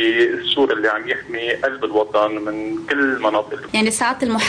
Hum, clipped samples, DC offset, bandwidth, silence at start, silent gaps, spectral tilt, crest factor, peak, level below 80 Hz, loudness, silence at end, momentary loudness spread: none; under 0.1%; under 0.1%; 10.5 kHz; 0 s; none; -3 dB/octave; 12 dB; -6 dBFS; -56 dBFS; -19 LUFS; 0 s; 6 LU